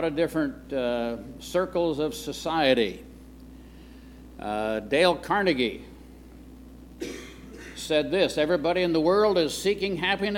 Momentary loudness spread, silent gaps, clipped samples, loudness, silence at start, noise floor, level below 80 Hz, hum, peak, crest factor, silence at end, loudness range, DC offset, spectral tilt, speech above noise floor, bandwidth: 17 LU; none; under 0.1%; -25 LUFS; 0 s; -46 dBFS; -50 dBFS; none; -6 dBFS; 20 dB; 0 s; 4 LU; under 0.1%; -4.5 dB/octave; 21 dB; 17 kHz